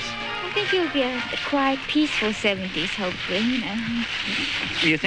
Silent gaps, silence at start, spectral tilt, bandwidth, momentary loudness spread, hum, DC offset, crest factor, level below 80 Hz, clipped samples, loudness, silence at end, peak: none; 0 s; -4 dB/octave; 10.5 kHz; 5 LU; none; under 0.1%; 16 dB; -50 dBFS; under 0.1%; -23 LUFS; 0 s; -8 dBFS